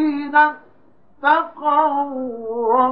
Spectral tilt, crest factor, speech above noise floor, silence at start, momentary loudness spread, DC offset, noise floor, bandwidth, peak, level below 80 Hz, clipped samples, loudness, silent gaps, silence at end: -7 dB/octave; 16 dB; 38 dB; 0 s; 10 LU; 0.3%; -56 dBFS; 5.4 kHz; -2 dBFS; -68 dBFS; under 0.1%; -18 LUFS; none; 0 s